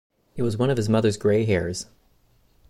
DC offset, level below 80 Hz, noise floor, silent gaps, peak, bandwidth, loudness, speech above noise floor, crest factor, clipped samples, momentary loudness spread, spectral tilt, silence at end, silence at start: under 0.1%; -50 dBFS; -61 dBFS; none; -8 dBFS; 12.5 kHz; -23 LUFS; 39 dB; 16 dB; under 0.1%; 15 LU; -6.5 dB/octave; 0.85 s; 0.35 s